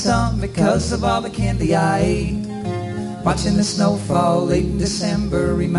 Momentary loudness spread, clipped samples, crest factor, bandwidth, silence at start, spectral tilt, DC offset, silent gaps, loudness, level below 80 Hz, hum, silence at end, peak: 8 LU; under 0.1%; 16 dB; 11.5 kHz; 0 s; -6 dB/octave; under 0.1%; none; -19 LUFS; -30 dBFS; none; 0 s; -4 dBFS